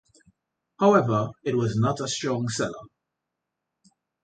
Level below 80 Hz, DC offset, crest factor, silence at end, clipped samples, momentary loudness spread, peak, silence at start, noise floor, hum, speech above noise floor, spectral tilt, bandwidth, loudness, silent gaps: -60 dBFS; under 0.1%; 20 dB; 1.35 s; under 0.1%; 9 LU; -6 dBFS; 0.8 s; -84 dBFS; none; 60 dB; -5.5 dB/octave; 9.4 kHz; -24 LUFS; none